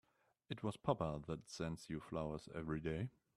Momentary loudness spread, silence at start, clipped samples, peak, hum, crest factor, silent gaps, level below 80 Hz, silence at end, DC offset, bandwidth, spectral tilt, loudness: 7 LU; 0.5 s; under 0.1%; -20 dBFS; none; 24 dB; none; -64 dBFS; 0.3 s; under 0.1%; 13 kHz; -6.5 dB/octave; -45 LUFS